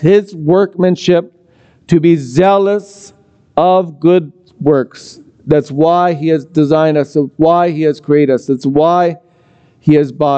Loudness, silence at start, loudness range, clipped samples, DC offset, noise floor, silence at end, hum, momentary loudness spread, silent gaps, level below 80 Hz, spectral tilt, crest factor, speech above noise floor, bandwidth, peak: -12 LUFS; 0 s; 2 LU; under 0.1%; under 0.1%; -49 dBFS; 0 s; none; 6 LU; none; -50 dBFS; -7.5 dB/octave; 12 dB; 38 dB; 8.6 kHz; 0 dBFS